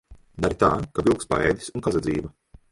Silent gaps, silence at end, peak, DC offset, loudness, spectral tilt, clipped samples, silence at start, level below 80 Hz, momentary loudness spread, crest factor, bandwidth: none; 0.45 s; -4 dBFS; under 0.1%; -24 LUFS; -6 dB/octave; under 0.1%; 0.1 s; -42 dBFS; 7 LU; 20 dB; 11.5 kHz